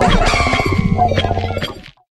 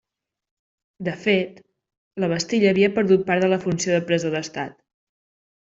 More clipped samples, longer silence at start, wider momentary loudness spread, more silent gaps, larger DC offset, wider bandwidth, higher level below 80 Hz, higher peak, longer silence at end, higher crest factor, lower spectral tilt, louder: neither; second, 0 s vs 1 s; second, 11 LU vs 14 LU; second, none vs 1.97-2.11 s; neither; first, 12.5 kHz vs 7.8 kHz; first, -24 dBFS vs -62 dBFS; about the same, -2 dBFS vs -4 dBFS; second, 0.3 s vs 1 s; about the same, 14 dB vs 18 dB; about the same, -5.5 dB/octave vs -5 dB/octave; first, -16 LUFS vs -21 LUFS